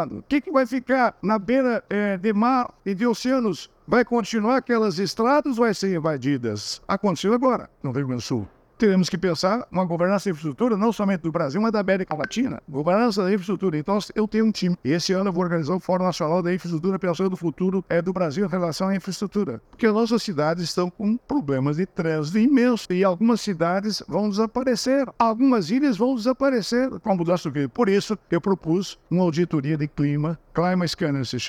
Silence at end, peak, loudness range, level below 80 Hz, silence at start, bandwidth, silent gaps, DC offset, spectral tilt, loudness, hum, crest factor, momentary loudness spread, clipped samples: 0 s; -6 dBFS; 2 LU; -56 dBFS; 0 s; 14.5 kHz; none; under 0.1%; -6 dB/octave; -23 LUFS; none; 16 dB; 6 LU; under 0.1%